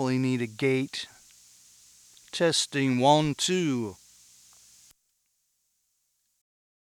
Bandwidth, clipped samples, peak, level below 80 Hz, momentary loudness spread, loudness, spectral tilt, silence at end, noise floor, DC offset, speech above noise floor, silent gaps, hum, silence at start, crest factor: 16 kHz; under 0.1%; -8 dBFS; -68 dBFS; 15 LU; -26 LUFS; -4.5 dB/octave; 3 s; -75 dBFS; under 0.1%; 49 dB; none; 60 Hz at -55 dBFS; 0 s; 22 dB